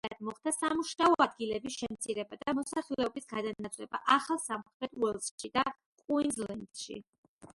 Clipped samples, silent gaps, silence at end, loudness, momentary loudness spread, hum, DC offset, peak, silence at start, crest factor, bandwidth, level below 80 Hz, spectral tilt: under 0.1%; 4.74-4.80 s, 5.31-5.38 s, 5.86-5.98 s, 7.09-7.39 s; 0.05 s; -33 LUFS; 13 LU; none; under 0.1%; -10 dBFS; 0.05 s; 24 dB; 12 kHz; -68 dBFS; -3 dB/octave